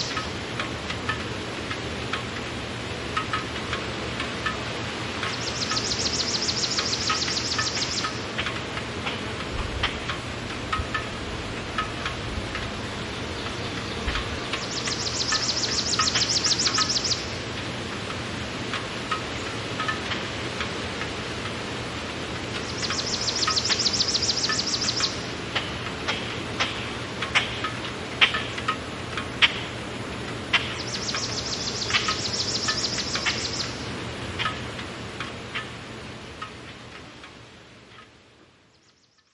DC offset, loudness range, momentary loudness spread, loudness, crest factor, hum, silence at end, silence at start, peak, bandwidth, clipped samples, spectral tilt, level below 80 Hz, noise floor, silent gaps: under 0.1%; 7 LU; 11 LU; -26 LUFS; 26 dB; none; 0.9 s; 0 s; -2 dBFS; 11.5 kHz; under 0.1%; -2.5 dB/octave; -46 dBFS; -61 dBFS; none